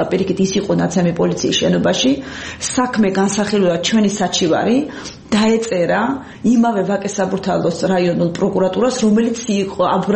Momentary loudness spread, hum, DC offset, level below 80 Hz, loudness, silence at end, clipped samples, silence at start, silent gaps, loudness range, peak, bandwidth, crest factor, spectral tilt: 5 LU; none; under 0.1%; -48 dBFS; -16 LUFS; 0 s; under 0.1%; 0 s; none; 1 LU; -4 dBFS; 8.8 kHz; 12 dB; -5 dB/octave